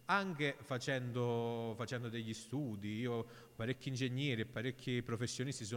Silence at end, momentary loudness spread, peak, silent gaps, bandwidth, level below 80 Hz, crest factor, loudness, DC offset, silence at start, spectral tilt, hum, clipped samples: 0 s; 6 LU; -22 dBFS; none; 16.5 kHz; -72 dBFS; 18 dB; -40 LUFS; under 0.1%; 0 s; -5.5 dB/octave; none; under 0.1%